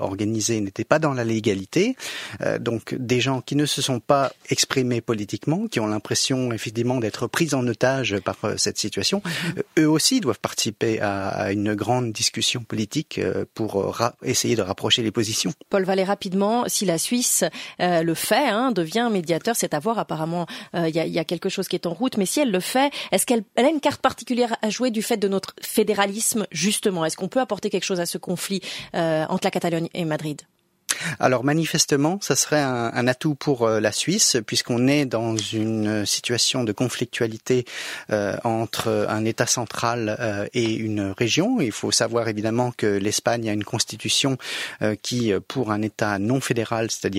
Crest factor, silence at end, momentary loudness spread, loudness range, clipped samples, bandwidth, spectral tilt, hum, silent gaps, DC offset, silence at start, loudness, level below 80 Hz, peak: 22 dB; 0 s; 6 LU; 3 LU; under 0.1%; 16 kHz; -4 dB/octave; none; none; under 0.1%; 0 s; -23 LUFS; -62 dBFS; 0 dBFS